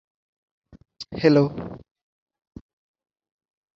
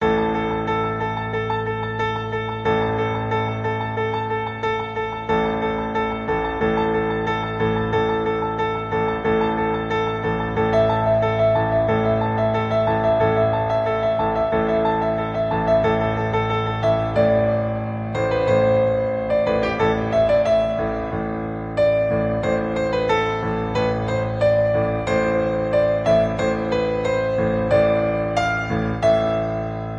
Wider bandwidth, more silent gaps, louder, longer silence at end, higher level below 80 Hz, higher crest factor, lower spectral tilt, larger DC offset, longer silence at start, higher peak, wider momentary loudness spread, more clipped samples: second, 7.4 kHz vs 9 kHz; neither; about the same, -20 LUFS vs -21 LUFS; first, 2 s vs 0 s; second, -56 dBFS vs -40 dBFS; first, 24 dB vs 14 dB; about the same, -8 dB/octave vs -7.5 dB/octave; neither; first, 1 s vs 0 s; about the same, -4 dBFS vs -6 dBFS; first, 23 LU vs 6 LU; neither